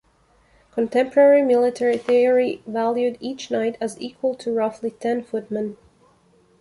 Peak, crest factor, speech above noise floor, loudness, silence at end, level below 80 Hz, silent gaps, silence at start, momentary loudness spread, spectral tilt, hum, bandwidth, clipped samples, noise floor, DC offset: -4 dBFS; 18 dB; 39 dB; -21 LUFS; 0.85 s; -66 dBFS; none; 0.75 s; 13 LU; -5.5 dB/octave; none; 11.5 kHz; under 0.1%; -59 dBFS; under 0.1%